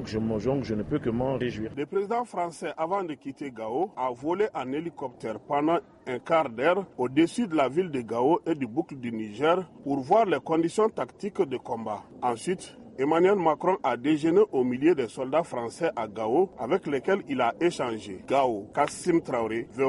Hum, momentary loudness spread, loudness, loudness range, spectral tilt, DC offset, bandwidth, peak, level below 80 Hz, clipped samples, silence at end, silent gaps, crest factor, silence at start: none; 10 LU; -27 LUFS; 5 LU; -6 dB/octave; under 0.1%; 11.5 kHz; -10 dBFS; -58 dBFS; under 0.1%; 0 s; none; 16 dB; 0 s